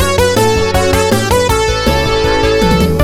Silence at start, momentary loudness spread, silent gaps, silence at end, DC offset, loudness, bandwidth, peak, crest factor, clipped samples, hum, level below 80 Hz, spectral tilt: 0 s; 2 LU; none; 0 s; under 0.1%; -11 LUFS; 18 kHz; 0 dBFS; 10 dB; under 0.1%; none; -22 dBFS; -4.5 dB/octave